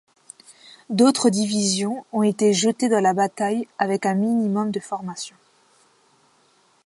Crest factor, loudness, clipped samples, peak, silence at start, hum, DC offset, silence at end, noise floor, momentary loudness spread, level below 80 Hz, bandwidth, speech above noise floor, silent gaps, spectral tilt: 18 dB; -21 LUFS; under 0.1%; -4 dBFS; 0.65 s; none; under 0.1%; 1.55 s; -60 dBFS; 11 LU; -72 dBFS; 11.5 kHz; 40 dB; none; -4.5 dB/octave